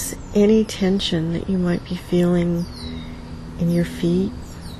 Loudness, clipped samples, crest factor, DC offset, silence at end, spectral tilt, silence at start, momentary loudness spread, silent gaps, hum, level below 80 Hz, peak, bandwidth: -20 LUFS; under 0.1%; 16 dB; under 0.1%; 0 s; -6.5 dB/octave; 0 s; 16 LU; none; none; -38 dBFS; -6 dBFS; 13.5 kHz